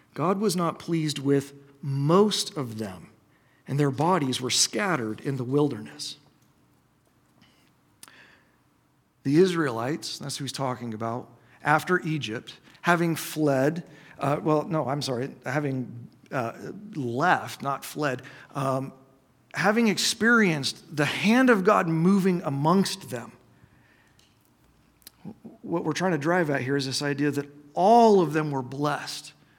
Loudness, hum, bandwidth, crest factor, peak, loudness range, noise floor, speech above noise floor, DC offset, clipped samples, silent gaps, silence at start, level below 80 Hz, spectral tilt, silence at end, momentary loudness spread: -25 LUFS; none; 18.5 kHz; 22 dB; -4 dBFS; 8 LU; -65 dBFS; 41 dB; under 0.1%; under 0.1%; none; 0.15 s; -70 dBFS; -5 dB/octave; 0.3 s; 16 LU